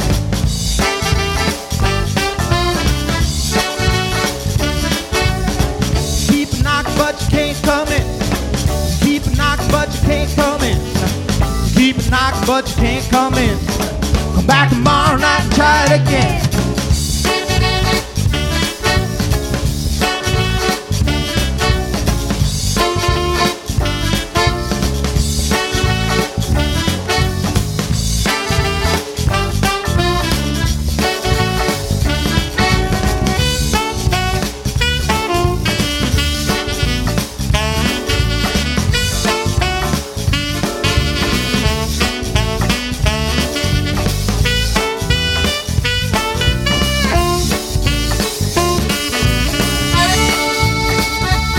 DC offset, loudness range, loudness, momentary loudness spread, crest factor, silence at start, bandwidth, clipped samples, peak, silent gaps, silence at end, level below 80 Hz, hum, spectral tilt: under 0.1%; 3 LU; -15 LUFS; 4 LU; 14 dB; 0 s; 17 kHz; under 0.1%; 0 dBFS; none; 0 s; -22 dBFS; none; -4.5 dB/octave